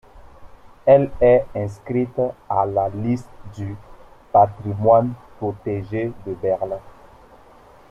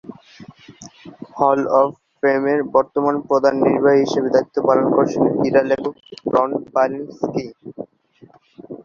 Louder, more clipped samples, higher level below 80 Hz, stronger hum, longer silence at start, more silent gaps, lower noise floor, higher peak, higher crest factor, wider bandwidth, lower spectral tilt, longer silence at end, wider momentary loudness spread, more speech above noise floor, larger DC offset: about the same, -20 LUFS vs -18 LUFS; neither; first, -46 dBFS vs -60 dBFS; neither; about the same, 0.15 s vs 0.05 s; neither; about the same, -48 dBFS vs -50 dBFS; about the same, -2 dBFS vs -2 dBFS; about the same, 18 dB vs 18 dB; first, 8.2 kHz vs 7.2 kHz; first, -9.5 dB/octave vs -6.5 dB/octave; first, 1 s vs 0.05 s; second, 16 LU vs 19 LU; second, 28 dB vs 33 dB; neither